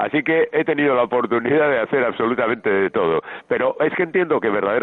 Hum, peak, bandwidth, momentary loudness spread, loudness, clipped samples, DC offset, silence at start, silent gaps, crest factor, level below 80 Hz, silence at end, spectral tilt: none; -6 dBFS; 4.1 kHz; 3 LU; -19 LUFS; under 0.1%; under 0.1%; 0 s; none; 12 dB; -62 dBFS; 0 s; -9 dB/octave